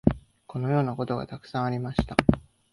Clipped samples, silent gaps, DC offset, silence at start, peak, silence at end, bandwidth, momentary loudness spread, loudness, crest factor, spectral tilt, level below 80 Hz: under 0.1%; none; under 0.1%; 0.05 s; -2 dBFS; 0.35 s; 11.5 kHz; 11 LU; -28 LUFS; 26 dB; -8 dB/octave; -42 dBFS